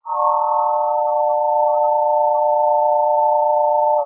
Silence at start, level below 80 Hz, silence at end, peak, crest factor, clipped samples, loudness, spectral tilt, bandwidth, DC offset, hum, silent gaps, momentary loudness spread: 0.05 s; under -90 dBFS; 0 s; -6 dBFS; 10 dB; under 0.1%; -17 LUFS; -6 dB/octave; 1.4 kHz; under 0.1%; none; none; 2 LU